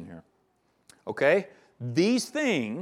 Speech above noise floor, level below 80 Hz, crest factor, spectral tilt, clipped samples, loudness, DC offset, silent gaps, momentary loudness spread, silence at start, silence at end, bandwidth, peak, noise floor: 44 dB; -76 dBFS; 18 dB; -5 dB/octave; under 0.1%; -26 LUFS; under 0.1%; none; 20 LU; 0 s; 0 s; 15 kHz; -10 dBFS; -70 dBFS